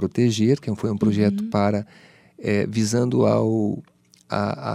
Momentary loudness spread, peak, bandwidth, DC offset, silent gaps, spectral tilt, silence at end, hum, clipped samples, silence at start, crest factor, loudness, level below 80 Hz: 10 LU; -6 dBFS; 13.5 kHz; under 0.1%; none; -6.5 dB/octave; 0 s; none; under 0.1%; 0 s; 16 dB; -22 LUFS; -60 dBFS